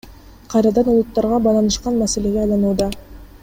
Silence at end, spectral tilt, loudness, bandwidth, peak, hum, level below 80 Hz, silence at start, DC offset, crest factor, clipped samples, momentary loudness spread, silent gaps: 0.05 s; -5.5 dB/octave; -17 LUFS; 16.5 kHz; -4 dBFS; none; -36 dBFS; 0.05 s; under 0.1%; 14 dB; under 0.1%; 6 LU; none